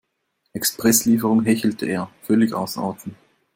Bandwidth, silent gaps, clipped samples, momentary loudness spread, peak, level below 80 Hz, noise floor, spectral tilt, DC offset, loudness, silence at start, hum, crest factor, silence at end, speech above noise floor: 16.5 kHz; none; under 0.1%; 13 LU; -4 dBFS; -60 dBFS; -73 dBFS; -4 dB/octave; under 0.1%; -20 LUFS; 0.55 s; none; 18 dB; 0.45 s; 53 dB